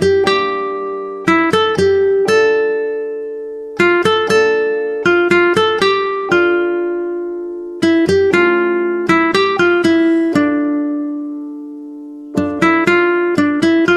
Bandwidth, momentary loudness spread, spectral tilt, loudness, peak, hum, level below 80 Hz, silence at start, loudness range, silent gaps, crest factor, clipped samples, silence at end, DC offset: 12 kHz; 12 LU; -5.5 dB/octave; -14 LUFS; 0 dBFS; none; -52 dBFS; 0 s; 3 LU; none; 14 dB; under 0.1%; 0 s; under 0.1%